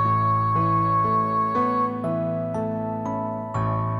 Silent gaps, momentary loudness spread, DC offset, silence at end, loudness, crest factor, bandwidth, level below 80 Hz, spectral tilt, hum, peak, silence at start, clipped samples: none; 7 LU; under 0.1%; 0 s; -23 LUFS; 12 dB; 7.6 kHz; -50 dBFS; -9.5 dB/octave; none; -12 dBFS; 0 s; under 0.1%